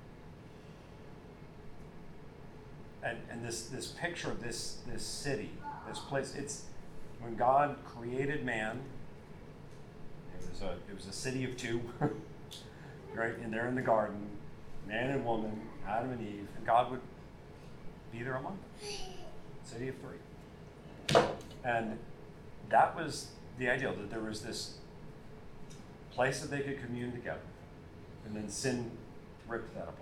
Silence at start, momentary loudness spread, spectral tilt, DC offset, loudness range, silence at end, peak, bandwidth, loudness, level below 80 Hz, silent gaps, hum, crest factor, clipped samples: 0 s; 22 LU; -4.5 dB/octave; under 0.1%; 8 LU; 0 s; -10 dBFS; 16.5 kHz; -37 LUFS; -56 dBFS; none; none; 26 dB; under 0.1%